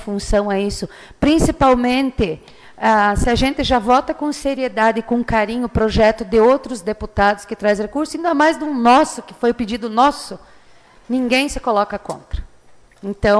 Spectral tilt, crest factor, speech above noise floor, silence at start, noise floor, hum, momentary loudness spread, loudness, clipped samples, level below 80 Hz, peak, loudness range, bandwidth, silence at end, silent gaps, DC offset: -5 dB/octave; 14 dB; 30 dB; 0 s; -46 dBFS; none; 14 LU; -17 LUFS; under 0.1%; -32 dBFS; -4 dBFS; 3 LU; 11 kHz; 0 s; none; under 0.1%